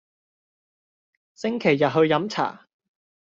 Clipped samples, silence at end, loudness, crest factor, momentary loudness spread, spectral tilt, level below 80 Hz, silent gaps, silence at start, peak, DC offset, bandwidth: under 0.1%; 0.7 s; -22 LUFS; 20 dB; 10 LU; -4.5 dB/octave; -68 dBFS; none; 1.4 s; -6 dBFS; under 0.1%; 7.6 kHz